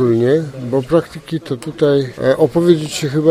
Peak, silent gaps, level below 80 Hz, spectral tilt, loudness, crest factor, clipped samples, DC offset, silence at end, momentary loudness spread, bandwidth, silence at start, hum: 0 dBFS; none; -48 dBFS; -6.5 dB/octave; -16 LUFS; 14 dB; under 0.1%; under 0.1%; 0 s; 10 LU; 15 kHz; 0 s; none